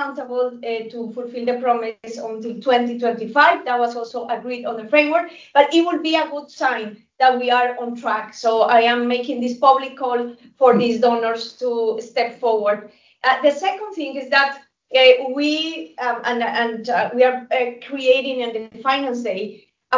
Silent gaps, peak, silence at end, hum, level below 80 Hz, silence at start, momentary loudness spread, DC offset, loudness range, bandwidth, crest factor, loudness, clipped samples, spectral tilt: none; 0 dBFS; 0 s; none; -72 dBFS; 0 s; 12 LU; under 0.1%; 3 LU; 7.6 kHz; 18 dB; -19 LUFS; under 0.1%; -4 dB/octave